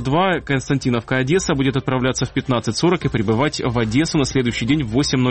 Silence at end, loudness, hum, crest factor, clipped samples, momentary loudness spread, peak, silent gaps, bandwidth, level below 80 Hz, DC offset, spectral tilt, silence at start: 0 s; -19 LUFS; none; 14 dB; under 0.1%; 3 LU; -4 dBFS; none; 8.8 kHz; -40 dBFS; 0.2%; -5.5 dB/octave; 0 s